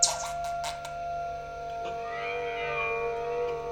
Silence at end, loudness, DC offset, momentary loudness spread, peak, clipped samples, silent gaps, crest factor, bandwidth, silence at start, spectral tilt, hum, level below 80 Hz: 0 s; -32 LUFS; under 0.1%; 7 LU; -8 dBFS; under 0.1%; none; 24 dB; 17.5 kHz; 0 s; -1 dB/octave; 50 Hz at -60 dBFS; -54 dBFS